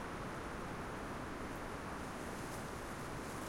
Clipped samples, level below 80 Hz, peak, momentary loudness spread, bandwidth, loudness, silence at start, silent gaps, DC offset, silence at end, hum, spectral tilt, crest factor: under 0.1%; -56 dBFS; -32 dBFS; 0 LU; 16.5 kHz; -45 LUFS; 0 s; none; under 0.1%; 0 s; none; -5 dB/octave; 12 dB